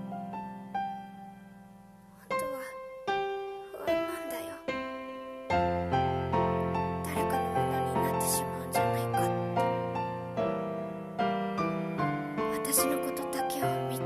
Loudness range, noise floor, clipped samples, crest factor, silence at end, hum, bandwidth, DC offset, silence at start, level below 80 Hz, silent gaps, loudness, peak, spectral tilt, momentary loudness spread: 6 LU; -53 dBFS; under 0.1%; 20 dB; 0 s; none; 14 kHz; under 0.1%; 0 s; -56 dBFS; none; -32 LUFS; -10 dBFS; -5 dB/octave; 11 LU